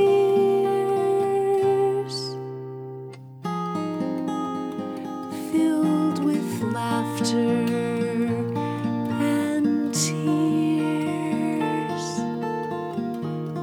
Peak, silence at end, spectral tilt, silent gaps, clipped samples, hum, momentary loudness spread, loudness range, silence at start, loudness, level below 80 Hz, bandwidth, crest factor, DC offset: -10 dBFS; 0 s; -6 dB/octave; none; under 0.1%; none; 10 LU; 4 LU; 0 s; -24 LUFS; -74 dBFS; 18 kHz; 14 dB; under 0.1%